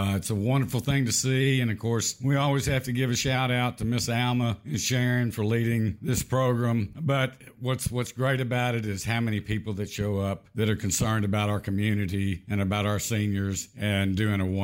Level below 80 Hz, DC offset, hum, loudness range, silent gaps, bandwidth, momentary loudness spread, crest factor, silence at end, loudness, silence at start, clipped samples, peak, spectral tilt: -50 dBFS; under 0.1%; none; 3 LU; none; 16 kHz; 5 LU; 14 dB; 0 s; -27 LUFS; 0 s; under 0.1%; -12 dBFS; -5 dB/octave